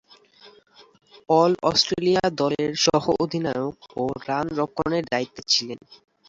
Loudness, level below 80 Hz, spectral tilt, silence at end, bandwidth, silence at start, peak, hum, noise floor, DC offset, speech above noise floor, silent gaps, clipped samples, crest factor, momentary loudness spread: -23 LUFS; -56 dBFS; -4 dB/octave; 0.35 s; 7.8 kHz; 0.45 s; -4 dBFS; none; -53 dBFS; under 0.1%; 30 dB; none; under 0.1%; 20 dB; 9 LU